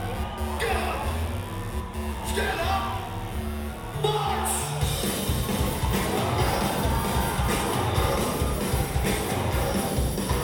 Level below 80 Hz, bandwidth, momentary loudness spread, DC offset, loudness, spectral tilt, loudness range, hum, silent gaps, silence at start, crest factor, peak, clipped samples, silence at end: -32 dBFS; 19 kHz; 8 LU; under 0.1%; -27 LUFS; -4.5 dB/octave; 4 LU; none; none; 0 s; 16 dB; -10 dBFS; under 0.1%; 0 s